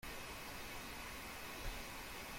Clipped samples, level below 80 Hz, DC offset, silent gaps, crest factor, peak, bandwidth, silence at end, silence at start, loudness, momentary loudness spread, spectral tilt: under 0.1%; -56 dBFS; under 0.1%; none; 16 dB; -32 dBFS; 16.5 kHz; 0 s; 0 s; -48 LUFS; 1 LU; -2.5 dB/octave